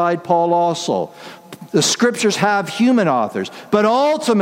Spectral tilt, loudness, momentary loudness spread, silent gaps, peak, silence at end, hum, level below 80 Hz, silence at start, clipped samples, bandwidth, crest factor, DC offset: -4 dB/octave; -17 LUFS; 12 LU; none; -2 dBFS; 0 s; none; -66 dBFS; 0 s; under 0.1%; 16 kHz; 16 dB; under 0.1%